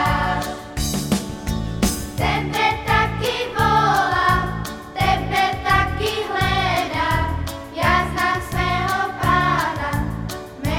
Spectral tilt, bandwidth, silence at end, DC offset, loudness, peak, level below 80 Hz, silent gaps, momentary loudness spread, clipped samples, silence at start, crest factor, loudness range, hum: -4.5 dB/octave; 18 kHz; 0 s; under 0.1%; -20 LUFS; -4 dBFS; -32 dBFS; none; 9 LU; under 0.1%; 0 s; 16 dB; 2 LU; none